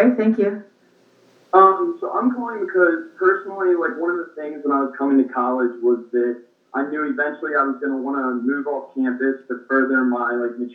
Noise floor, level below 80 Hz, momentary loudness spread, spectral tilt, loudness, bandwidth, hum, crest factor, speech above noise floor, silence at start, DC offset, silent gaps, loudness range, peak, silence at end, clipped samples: -56 dBFS; under -90 dBFS; 8 LU; -8.5 dB/octave; -20 LUFS; 4.3 kHz; none; 20 dB; 36 dB; 0 s; under 0.1%; none; 4 LU; 0 dBFS; 0 s; under 0.1%